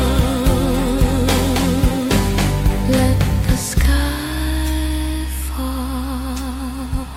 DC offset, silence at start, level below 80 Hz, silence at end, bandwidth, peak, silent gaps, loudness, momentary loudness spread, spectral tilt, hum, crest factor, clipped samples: under 0.1%; 0 s; -20 dBFS; 0 s; 16.5 kHz; -4 dBFS; none; -19 LUFS; 8 LU; -5.5 dB/octave; none; 14 dB; under 0.1%